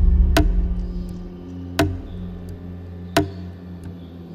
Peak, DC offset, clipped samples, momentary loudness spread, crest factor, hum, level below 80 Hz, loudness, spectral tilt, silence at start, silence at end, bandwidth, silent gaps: -2 dBFS; under 0.1%; under 0.1%; 17 LU; 20 dB; none; -24 dBFS; -24 LUFS; -6 dB/octave; 0 s; 0 s; 16 kHz; none